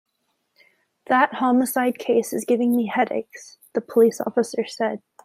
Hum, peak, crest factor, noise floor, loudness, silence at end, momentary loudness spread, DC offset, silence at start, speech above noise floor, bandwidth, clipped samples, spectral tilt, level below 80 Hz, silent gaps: none; -4 dBFS; 18 dB; -73 dBFS; -22 LUFS; 0.25 s; 11 LU; under 0.1%; 1.1 s; 52 dB; 15.5 kHz; under 0.1%; -4.5 dB/octave; -74 dBFS; none